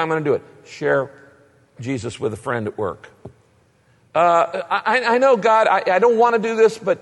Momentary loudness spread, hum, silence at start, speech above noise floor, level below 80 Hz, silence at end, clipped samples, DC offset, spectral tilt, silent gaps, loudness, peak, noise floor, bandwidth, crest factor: 12 LU; none; 0 s; 39 dB; -62 dBFS; 0.05 s; under 0.1%; under 0.1%; -5.5 dB/octave; none; -18 LUFS; -4 dBFS; -57 dBFS; 11.5 kHz; 14 dB